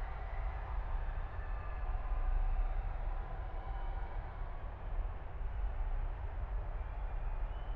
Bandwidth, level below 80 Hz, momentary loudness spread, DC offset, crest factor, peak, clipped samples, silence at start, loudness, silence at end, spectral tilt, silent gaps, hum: 3.9 kHz; -38 dBFS; 5 LU; under 0.1%; 12 dB; -26 dBFS; under 0.1%; 0 s; -43 LUFS; 0 s; -6.5 dB/octave; none; none